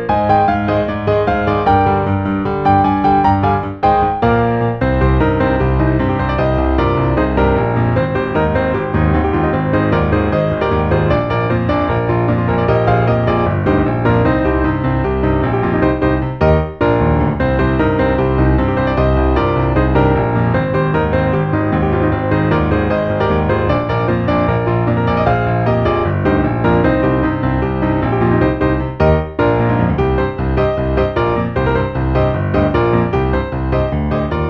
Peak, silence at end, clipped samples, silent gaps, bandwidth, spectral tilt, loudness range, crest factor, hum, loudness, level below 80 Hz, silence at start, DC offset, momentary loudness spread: 0 dBFS; 0 s; under 0.1%; none; 5.8 kHz; -10 dB/octave; 1 LU; 14 dB; none; -15 LUFS; -24 dBFS; 0 s; under 0.1%; 3 LU